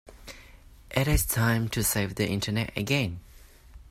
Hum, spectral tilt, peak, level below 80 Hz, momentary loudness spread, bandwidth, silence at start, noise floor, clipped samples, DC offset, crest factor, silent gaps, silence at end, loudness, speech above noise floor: none; -4.5 dB/octave; -10 dBFS; -40 dBFS; 21 LU; 16 kHz; 0.05 s; -51 dBFS; under 0.1%; under 0.1%; 18 dB; none; 0.1 s; -27 LUFS; 25 dB